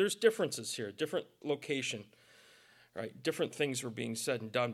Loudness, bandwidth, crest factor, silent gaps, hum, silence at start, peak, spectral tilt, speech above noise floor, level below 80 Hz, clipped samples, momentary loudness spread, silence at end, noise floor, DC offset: -36 LUFS; 15.5 kHz; 22 dB; none; none; 0 s; -14 dBFS; -3.5 dB/octave; 27 dB; -84 dBFS; under 0.1%; 10 LU; 0 s; -63 dBFS; under 0.1%